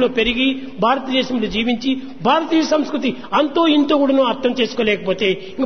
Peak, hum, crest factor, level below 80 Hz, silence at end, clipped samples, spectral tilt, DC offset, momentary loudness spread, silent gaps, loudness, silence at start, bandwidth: -2 dBFS; none; 14 dB; -46 dBFS; 0 s; under 0.1%; -5 dB/octave; 1%; 5 LU; none; -17 LUFS; 0 s; 6.6 kHz